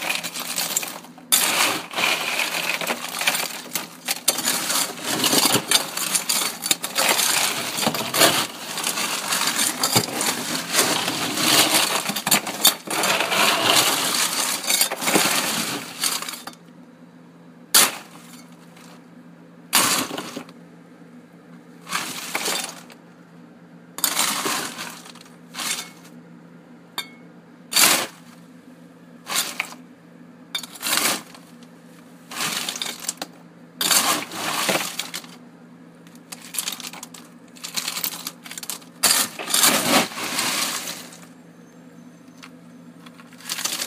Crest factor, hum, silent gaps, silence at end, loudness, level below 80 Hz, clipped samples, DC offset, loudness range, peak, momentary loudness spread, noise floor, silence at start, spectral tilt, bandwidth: 24 dB; none; none; 0 s; -20 LUFS; -74 dBFS; under 0.1%; under 0.1%; 10 LU; 0 dBFS; 17 LU; -46 dBFS; 0 s; -0.5 dB/octave; 16 kHz